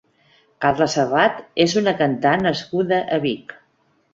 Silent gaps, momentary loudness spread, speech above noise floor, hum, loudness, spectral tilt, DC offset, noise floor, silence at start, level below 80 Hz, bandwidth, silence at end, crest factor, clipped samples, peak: none; 5 LU; 44 dB; none; -19 LUFS; -5 dB/octave; under 0.1%; -63 dBFS; 0.6 s; -56 dBFS; 7.8 kHz; 0.6 s; 18 dB; under 0.1%; -2 dBFS